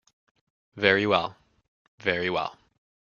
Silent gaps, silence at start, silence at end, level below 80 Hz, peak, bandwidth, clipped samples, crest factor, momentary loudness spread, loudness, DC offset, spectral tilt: 1.68-1.98 s; 0.75 s; 0.6 s; -66 dBFS; -2 dBFS; 7.2 kHz; under 0.1%; 26 dB; 12 LU; -25 LUFS; under 0.1%; -5.5 dB/octave